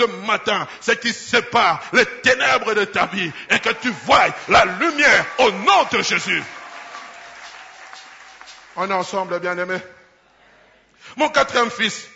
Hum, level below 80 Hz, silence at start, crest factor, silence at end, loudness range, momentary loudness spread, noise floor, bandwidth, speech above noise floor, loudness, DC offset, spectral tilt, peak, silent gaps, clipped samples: none; -54 dBFS; 0 s; 16 dB; 0.1 s; 11 LU; 22 LU; -53 dBFS; 8 kHz; 35 dB; -18 LUFS; under 0.1%; -2.5 dB/octave; -4 dBFS; none; under 0.1%